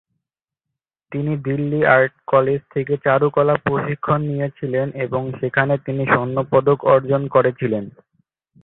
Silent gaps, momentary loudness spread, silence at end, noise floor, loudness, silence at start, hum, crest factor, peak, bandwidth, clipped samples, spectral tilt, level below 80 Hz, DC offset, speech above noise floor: none; 8 LU; 0.75 s; -84 dBFS; -19 LUFS; 1.1 s; none; 18 dB; -2 dBFS; 4.1 kHz; under 0.1%; -12 dB/octave; -54 dBFS; under 0.1%; 66 dB